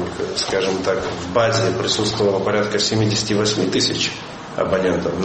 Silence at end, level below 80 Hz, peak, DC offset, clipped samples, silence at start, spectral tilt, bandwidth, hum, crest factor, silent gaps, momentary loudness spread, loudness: 0 s; -46 dBFS; -2 dBFS; under 0.1%; under 0.1%; 0 s; -4 dB/octave; 8.8 kHz; none; 16 dB; none; 5 LU; -19 LUFS